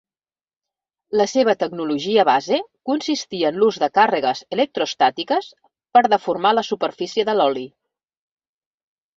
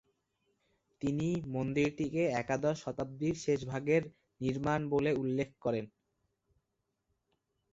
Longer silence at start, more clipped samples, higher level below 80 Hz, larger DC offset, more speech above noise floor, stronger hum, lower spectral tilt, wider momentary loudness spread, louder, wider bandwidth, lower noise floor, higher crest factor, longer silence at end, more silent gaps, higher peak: about the same, 1.1 s vs 1 s; neither; second, -68 dBFS vs -62 dBFS; neither; first, over 71 dB vs 51 dB; neither; second, -4 dB/octave vs -7 dB/octave; about the same, 7 LU vs 7 LU; first, -19 LUFS vs -34 LUFS; about the same, 7.6 kHz vs 8 kHz; first, under -90 dBFS vs -84 dBFS; about the same, 18 dB vs 18 dB; second, 1.5 s vs 1.85 s; neither; first, -2 dBFS vs -16 dBFS